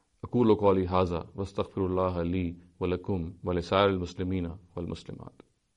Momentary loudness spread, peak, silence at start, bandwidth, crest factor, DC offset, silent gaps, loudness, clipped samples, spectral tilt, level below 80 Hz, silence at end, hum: 13 LU; -10 dBFS; 0.25 s; 10 kHz; 20 dB; under 0.1%; none; -29 LUFS; under 0.1%; -8 dB/octave; -50 dBFS; 0.5 s; none